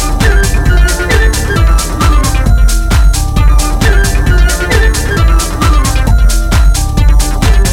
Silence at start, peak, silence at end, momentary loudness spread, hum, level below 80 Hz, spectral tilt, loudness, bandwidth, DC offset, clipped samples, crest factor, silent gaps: 0 s; 0 dBFS; 0 s; 1 LU; none; -8 dBFS; -4.5 dB/octave; -10 LUFS; 16 kHz; under 0.1%; under 0.1%; 8 dB; none